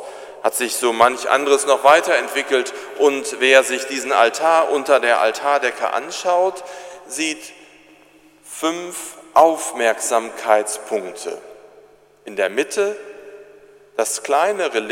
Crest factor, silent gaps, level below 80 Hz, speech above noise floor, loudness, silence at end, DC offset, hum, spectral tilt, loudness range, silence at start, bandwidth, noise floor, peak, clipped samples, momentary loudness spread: 18 dB; none; -68 dBFS; 32 dB; -18 LUFS; 0 s; under 0.1%; 50 Hz at -70 dBFS; -1 dB/octave; 8 LU; 0 s; 16.5 kHz; -50 dBFS; 0 dBFS; under 0.1%; 16 LU